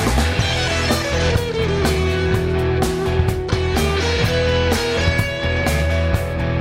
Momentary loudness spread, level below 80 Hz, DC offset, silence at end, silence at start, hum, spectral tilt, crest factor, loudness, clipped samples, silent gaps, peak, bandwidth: 2 LU; -26 dBFS; under 0.1%; 0 s; 0 s; none; -5 dB/octave; 14 dB; -19 LUFS; under 0.1%; none; -4 dBFS; 16 kHz